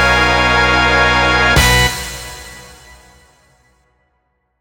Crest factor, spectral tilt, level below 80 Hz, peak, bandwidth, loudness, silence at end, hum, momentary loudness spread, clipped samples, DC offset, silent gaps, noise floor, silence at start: 16 dB; -3 dB/octave; -26 dBFS; 0 dBFS; 19 kHz; -11 LUFS; 1.95 s; none; 19 LU; under 0.1%; under 0.1%; none; -65 dBFS; 0 s